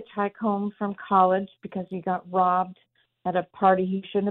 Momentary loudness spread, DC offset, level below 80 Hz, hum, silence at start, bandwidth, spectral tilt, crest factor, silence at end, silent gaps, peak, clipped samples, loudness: 12 LU; under 0.1%; -68 dBFS; none; 0 s; 4.1 kHz; -11 dB/octave; 18 dB; 0 s; none; -8 dBFS; under 0.1%; -25 LUFS